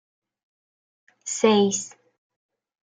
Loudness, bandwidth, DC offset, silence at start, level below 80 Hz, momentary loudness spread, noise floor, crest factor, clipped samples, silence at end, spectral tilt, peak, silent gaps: -22 LUFS; 9.6 kHz; under 0.1%; 1.25 s; -76 dBFS; 19 LU; under -90 dBFS; 22 dB; under 0.1%; 0.95 s; -4 dB/octave; -6 dBFS; none